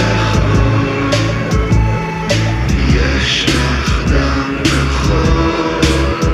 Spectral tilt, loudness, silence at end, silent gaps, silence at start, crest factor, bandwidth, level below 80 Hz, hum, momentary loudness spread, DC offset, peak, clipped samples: -5.5 dB/octave; -14 LUFS; 0 s; none; 0 s; 12 dB; 13 kHz; -18 dBFS; none; 3 LU; under 0.1%; 0 dBFS; under 0.1%